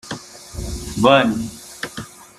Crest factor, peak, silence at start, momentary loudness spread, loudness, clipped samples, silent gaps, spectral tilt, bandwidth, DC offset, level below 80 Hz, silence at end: 20 dB; -2 dBFS; 0.05 s; 19 LU; -18 LUFS; under 0.1%; none; -4.5 dB/octave; 15 kHz; under 0.1%; -38 dBFS; 0.15 s